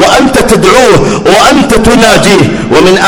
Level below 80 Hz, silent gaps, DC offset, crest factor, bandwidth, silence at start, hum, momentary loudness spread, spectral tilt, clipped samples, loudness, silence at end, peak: -22 dBFS; none; under 0.1%; 4 dB; over 20 kHz; 0 s; none; 3 LU; -4 dB/octave; 20%; -4 LUFS; 0 s; 0 dBFS